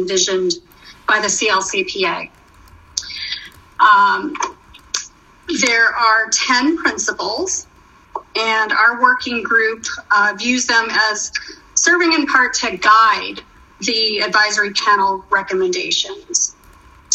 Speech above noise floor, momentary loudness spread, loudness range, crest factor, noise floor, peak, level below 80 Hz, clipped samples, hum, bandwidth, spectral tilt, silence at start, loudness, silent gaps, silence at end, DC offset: 29 dB; 13 LU; 4 LU; 18 dB; -45 dBFS; 0 dBFS; -52 dBFS; under 0.1%; none; 11.5 kHz; -0.5 dB/octave; 0 s; -15 LUFS; none; 0 s; under 0.1%